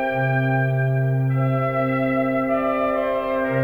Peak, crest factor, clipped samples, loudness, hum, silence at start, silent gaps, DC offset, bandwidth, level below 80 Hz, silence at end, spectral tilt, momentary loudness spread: -10 dBFS; 10 dB; under 0.1%; -21 LUFS; none; 0 s; none; under 0.1%; 4.2 kHz; -48 dBFS; 0 s; -9.5 dB/octave; 2 LU